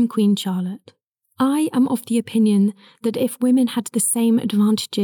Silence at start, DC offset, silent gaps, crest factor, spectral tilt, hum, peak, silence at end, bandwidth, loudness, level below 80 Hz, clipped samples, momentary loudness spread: 0 s; under 0.1%; none; 10 dB; -5 dB/octave; none; -10 dBFS; 0 s; 19 kHz; -19 LUFS; -82 dBFS; under 0.1%; 8 LU